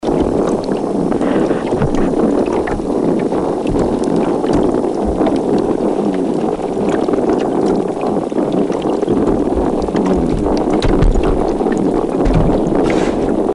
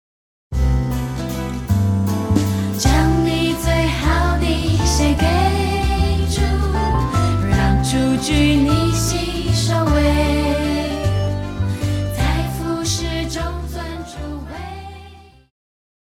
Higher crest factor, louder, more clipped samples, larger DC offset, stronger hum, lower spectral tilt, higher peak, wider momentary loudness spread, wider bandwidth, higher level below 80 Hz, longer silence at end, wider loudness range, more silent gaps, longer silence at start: second, 10 dB vs 16 dB; first, -15 LUFS vs -18 LUFS; neither; neither; neither; first, -7.5 dB/octave vs -5.5 dB/octave; about the same, -4 dBFS vs -2 dBFS; second, 3 LU vs 11 LU; second, 11.5 kHz vs 16.5 kHz; about the same, -26 dBFS vs -24 dBFS; second, 0 s vs 0.85 s; second, 1 LU vs 6 LU; neither; second, 0 s vs 0.5 s